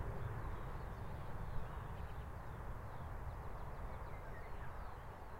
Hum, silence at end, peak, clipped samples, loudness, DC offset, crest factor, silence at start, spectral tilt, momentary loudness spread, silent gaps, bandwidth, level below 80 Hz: none; 0 s; -30 dBFS; under 0.1%; -50 LUFS; under 0.1%; 16 dB; 0 s; -7.5 dB/octave; 4 LU; none; 16 kHz; -50 dBFS